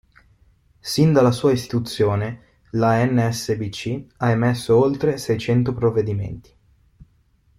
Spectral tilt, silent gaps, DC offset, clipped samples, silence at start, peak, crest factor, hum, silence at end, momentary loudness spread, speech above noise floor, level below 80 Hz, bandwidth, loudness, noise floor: -6.5 dB/octave; none; under 0.1%; under 0.1%; 0.85 s; -4 dBFS; 18 dB; none; 1.2 s; 12 LU; 40 dB; -50 dBFS; 15.5 kHz; -20 LUFS; -60 dBFS